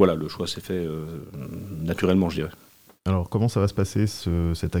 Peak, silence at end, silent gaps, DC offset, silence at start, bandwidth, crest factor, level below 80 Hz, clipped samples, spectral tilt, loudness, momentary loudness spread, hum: -4 dBFS; 0 s; none; under 0.1%; 0 s; 17.5 kHz; 22 dB; -46 dBFS; under 0.1%; -7 dB/octave; -26 LUFS; 13 LU; none